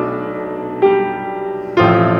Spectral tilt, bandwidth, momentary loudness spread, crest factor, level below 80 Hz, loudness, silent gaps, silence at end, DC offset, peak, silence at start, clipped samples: -9 dB/octave; 6.4 kHz; 11 LU; 16 dB; -50 dBFS; -17 LUFS; none; 0 s; under 0.1%; 0 dBFS; 0 s; under 0.1%